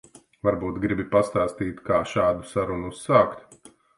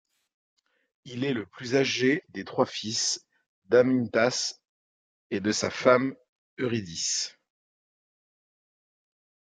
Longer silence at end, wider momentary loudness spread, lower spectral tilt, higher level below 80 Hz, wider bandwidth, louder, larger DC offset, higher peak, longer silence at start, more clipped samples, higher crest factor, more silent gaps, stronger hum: second, 0.45 s vs 2.2 s; about the same, 9 LU vs 11 LU; first, -6.5 dB/octave vs -3.5 dB/octave; first, -48 dBFS vs -72 dBFS; first, 11.5 kHz vs 9.6 kHz; first, -24 LUFS vs -27 LUFS; neither; about the same, -4 dBFS vs -6 dBFS; second, 0.45 s vs 1.05 s; neither; about the same, 20 dB vs 24 dB; second, none vs 3.46-3.62 s, 4.69-5.30 s, 6.29-6.57 s; neither